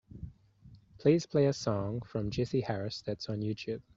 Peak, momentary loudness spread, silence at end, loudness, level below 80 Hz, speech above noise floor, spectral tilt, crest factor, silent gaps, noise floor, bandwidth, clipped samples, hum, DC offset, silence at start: -12 dBFS; 10 LU; 0.15 s; -33 LUFS; -58 dBFS; 26 dB; -6.5 dB/octave; 20 dB; none; -58 dBFS; 7.8 kHz; under 0.1%; none; under 0.1%; 0.15 s